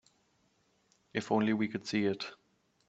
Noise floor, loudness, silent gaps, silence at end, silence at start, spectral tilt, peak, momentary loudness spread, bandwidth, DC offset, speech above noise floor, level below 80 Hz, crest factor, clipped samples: -73 dBFS; -33 LUFS; none; 0.55 s; 1.15 s; -6 dB/octave; -14 dBFS; 10 LU; 8 kHz; under 0.1%; 41 dB; -74 dBFS; 20 dB; under 0.1%